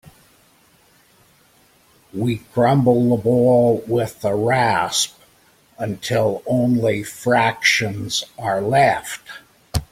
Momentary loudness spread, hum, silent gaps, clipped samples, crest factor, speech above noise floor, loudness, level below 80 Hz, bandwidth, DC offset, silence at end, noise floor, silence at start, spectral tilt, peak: 12 LU; none; none; under 0.1%; 18 dB; 37 dB; -18 LUFS; -46 dBFS; 16.5 kHz; under 0.1%; 0.1 s; -55 dBFS; 0.05 s; -5 dB/octave; -2 dBFS